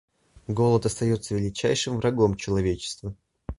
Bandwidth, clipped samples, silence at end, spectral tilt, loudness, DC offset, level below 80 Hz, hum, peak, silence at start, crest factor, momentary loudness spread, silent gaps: 11.5 kHz; under 0.1%; 0.05 s; -5.5 dB/octave; -25 LUFS; under 0.1%; -44 dBFS; none; -8 dBFS; 0.5 s; 16 dB; 14 LU; none